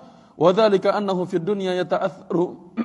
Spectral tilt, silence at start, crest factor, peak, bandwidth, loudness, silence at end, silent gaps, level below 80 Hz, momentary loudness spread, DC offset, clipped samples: -7 dB/octave; 0 s; 20 dB; -2 dBFS; 11 kHz; -21 LUFS; 0 s; none; -68 dBFS; 7 LU; under 0.1%; under 0.1%